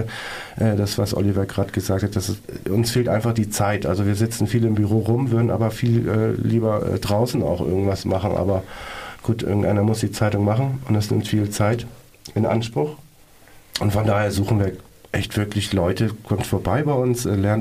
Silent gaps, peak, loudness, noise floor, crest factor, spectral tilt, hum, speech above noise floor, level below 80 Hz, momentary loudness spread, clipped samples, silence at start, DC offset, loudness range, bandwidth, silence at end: none; -6 dBFS; -21 LUFS; -48 dBFS; 16 dB; -6.5 dB/octave; none; 28 dB; -44 dBFS; 7 LU; under 0.1%; 0 s; under 0.1%; 3 LU; 15.5 kHz; 0 s